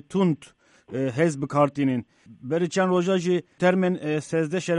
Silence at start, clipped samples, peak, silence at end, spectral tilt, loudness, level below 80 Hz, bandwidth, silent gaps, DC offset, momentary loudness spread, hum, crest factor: 0.1 s; under 0.1%; -8 dBFS; 0 s; -6.5 dB/octave; -24 LUFS; -66 dBFS; 11 kHz; none; under 0.1%; 8 LU; none; 16 dB